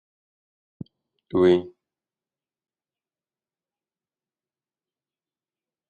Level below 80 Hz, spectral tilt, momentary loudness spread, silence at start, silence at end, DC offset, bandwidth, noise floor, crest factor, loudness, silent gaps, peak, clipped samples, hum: -66 dBFS; -8 dB/octave; 25 LU; 1.35 s; 4.2 s; under 0.1%; 6.8 kHz; under -90 dBFS; 24 dB; -21 LUFS; none; -8 dBFS; under 0.1%; none